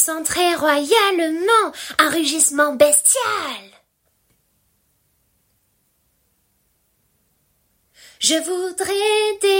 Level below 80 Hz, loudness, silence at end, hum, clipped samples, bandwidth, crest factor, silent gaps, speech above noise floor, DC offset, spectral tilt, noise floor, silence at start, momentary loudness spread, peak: -60 dBFS; -17 LUFS; 0 s; none; under 0.1%; 16.5 kHz; 20 dB; none; 48 dB; under 0.1%; -0.5 dB/octave; -65 dBFS; 0 s; 9 LU; 0 dBFS